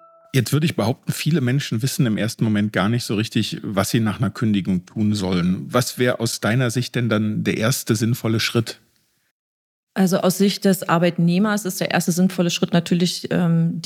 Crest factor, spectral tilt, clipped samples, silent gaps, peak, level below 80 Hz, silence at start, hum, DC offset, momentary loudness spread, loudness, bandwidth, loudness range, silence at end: 18 dB; -5.5 dB/octave; under 0.1%; 9.31-9.87 s; -2 dBFS; -64 dBFS; 0.35 s; none; under 0.1%; 4 LU; -20 LUFS; 16.5 kHz; 2 LU; 0 s